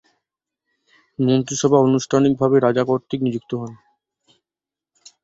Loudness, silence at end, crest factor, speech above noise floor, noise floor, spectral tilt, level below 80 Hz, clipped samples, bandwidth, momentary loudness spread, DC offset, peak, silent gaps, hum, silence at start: -19 LUFS; 1.5 s; 18 dB; 72 dB; -89 dBFS; -6 dB/octave; -60 dBFS; under 0.1%; 8 kHz; 13 LU; under 0.1%; -2 dBFS; none; none; 1.2 s